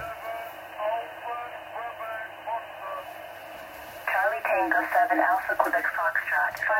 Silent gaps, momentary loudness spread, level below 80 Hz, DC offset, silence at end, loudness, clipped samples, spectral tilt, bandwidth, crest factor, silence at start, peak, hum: none; 16 LU; -66 dBFS; under 0.1%; 0 s; -27 LUFS; under 0.1%; -3.5 dB/octave; 16 kHz; 22 dB; 0 s; -6 dBFS; none